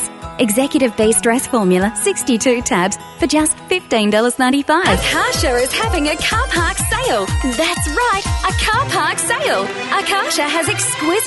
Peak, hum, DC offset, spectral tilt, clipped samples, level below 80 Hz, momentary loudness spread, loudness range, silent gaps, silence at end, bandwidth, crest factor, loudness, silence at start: 0 dBFS; none; under 0.1%; -3.5 dB/octave; under 0.1%; -30 dBFS; 4 LU; 1 LU; none; 0 s; 12 kHz; 16 dB; -15 LUFS; 0 s